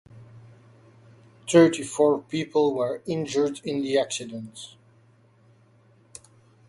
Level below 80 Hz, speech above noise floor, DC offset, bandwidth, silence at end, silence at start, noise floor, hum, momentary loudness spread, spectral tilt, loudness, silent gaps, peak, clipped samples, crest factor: -68 dBFS; 35 dB; under 0.1%; 11.5 kHz; 2 s; 0.15 s; -58 dBFS; none; 24 LU; -5 dB/octave; -24 LUFS; none; -4 dBFS; under 0.1%; 22 dB